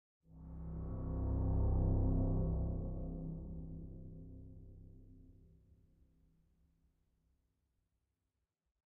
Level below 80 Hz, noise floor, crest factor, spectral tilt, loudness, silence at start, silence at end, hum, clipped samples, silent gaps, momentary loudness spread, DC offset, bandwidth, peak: -44 dBFS; -88 dBFS; 18 dB; -13 dB/octave; -40 LUFS; 0.3 s; 3.55 s; none; under 0.1%; none; 22 LU; under 0.1%; 1.8 kHz; -24 dBFS